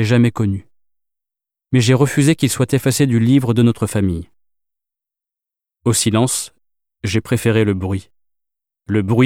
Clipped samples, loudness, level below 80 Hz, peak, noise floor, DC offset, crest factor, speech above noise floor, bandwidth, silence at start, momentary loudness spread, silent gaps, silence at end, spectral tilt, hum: under 0.1%; -16 LUFS; -48 dBFS; -2 dBFS; -87 dBFS; under 0.1%; 16 dB; 72 dB; 16.5 kHz; 0 s; 10 LU; none; 0 s; -5.5 dB/octave; none